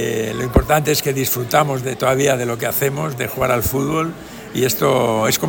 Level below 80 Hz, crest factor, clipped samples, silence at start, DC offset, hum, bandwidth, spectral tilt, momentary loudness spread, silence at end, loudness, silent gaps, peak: -34 dBFS; 16 dB; under 0.1%; 0 s; under 0.1%; none; 17 kHz; -4.5 dB/octave; 6 LU; 0 s; -18 LUFS; none; -2 dBFS